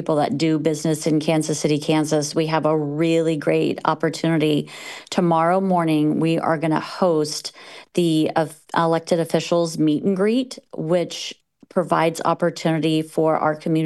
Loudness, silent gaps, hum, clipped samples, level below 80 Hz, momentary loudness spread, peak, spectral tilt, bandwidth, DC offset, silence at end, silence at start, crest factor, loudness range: -21 LUFS; none; none; under 0.1%; -68 dBFS; 6 LU; 0 dBFS; -5.5 dB/octave; 12.5 kHz; under 0.1%; 0 s; 0 s; 20 dB; 2 LU